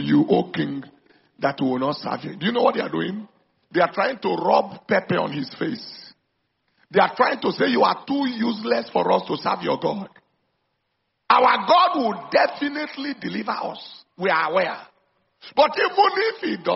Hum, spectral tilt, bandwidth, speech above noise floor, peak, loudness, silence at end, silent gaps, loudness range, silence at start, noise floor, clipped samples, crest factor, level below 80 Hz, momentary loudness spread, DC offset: none; -3 dB/octave; 6 kHz; 53 dB; -2 dBFS; -22 LUFS; 0 s; none; 4 LU; 0 s; -74 dBFS; under 0.1%; 20 dB; -68 dBFS; 11 LU; under 0.1%